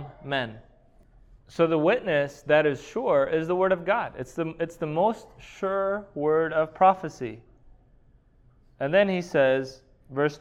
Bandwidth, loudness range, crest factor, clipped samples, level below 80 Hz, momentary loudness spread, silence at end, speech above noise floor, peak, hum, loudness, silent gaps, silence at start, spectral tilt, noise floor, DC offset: 11 kHz; 3 LU; 20 dB; under 0.1%; -58 dBFS; 13 LU; 0.05 s; 33 dB; -6 dBFS; none; -25 LUFS; none; 0 s; -6.5 dB/octave; -58 dBFS; under 0.1%